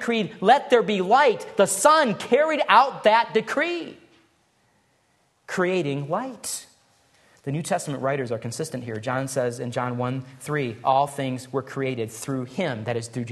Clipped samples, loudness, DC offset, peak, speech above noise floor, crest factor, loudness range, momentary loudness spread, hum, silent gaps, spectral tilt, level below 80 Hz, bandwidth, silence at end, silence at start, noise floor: under 0.1%; -23 LUFS; under 0.1%; -2 dBFS; 43 dB; 22 dB; 10 LU; 13 LU; none; none; -4.5 dB/octave; -68 dBFS; 13 kHz; 0 s; 0 s; -66 dBFS